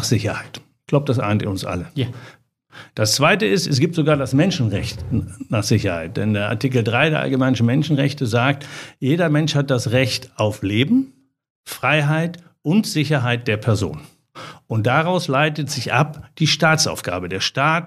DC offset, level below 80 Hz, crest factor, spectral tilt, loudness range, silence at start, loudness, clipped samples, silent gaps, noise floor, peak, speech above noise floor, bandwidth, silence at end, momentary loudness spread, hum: under 0.1%; -50 dBFS; 18 dB; -5 dB/octave; 2 LU; 0 s; -19 LUFS; under 0.1%; 11.50-11.64 s; -39 dBFS; -2 dBFS; 20 dB; 14.5 kHz; 0 s; 10 LU; none